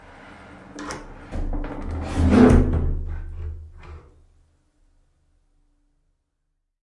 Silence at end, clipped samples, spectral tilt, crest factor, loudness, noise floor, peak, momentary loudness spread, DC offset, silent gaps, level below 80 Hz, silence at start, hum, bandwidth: 2.85 s; under 0.1%; -8 dB/octave; 22 dB; -21 LUFS; -75 dBFS; -2 dBFS; 29 LU; under 0.1%; none; -30 dBFS; 0.25 s; none; 11.5 kHz